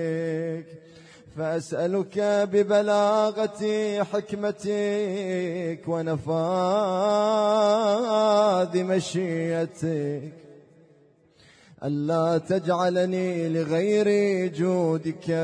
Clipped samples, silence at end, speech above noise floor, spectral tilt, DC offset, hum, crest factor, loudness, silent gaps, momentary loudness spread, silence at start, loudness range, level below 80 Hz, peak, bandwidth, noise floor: under 0.1%; 0 s; 34 dB; -6 dB/octave; under 0.1%; none; 14 dB; -24 LUFS; none; 8 LU; 0 s; 6 LU; -68 dBFS; -10 dBFS; 10.5 kHz; -58 dBFS